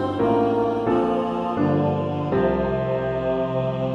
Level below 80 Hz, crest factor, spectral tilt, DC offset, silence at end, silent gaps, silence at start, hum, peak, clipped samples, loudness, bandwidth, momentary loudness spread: -44 dBFS; 14 dB; -9 dB/octave; under 0.1%; 0 s; none; 0 s; none; -8 dBFS; under 0.1%; -22 LUFS; 9.6 kHz; 4 LU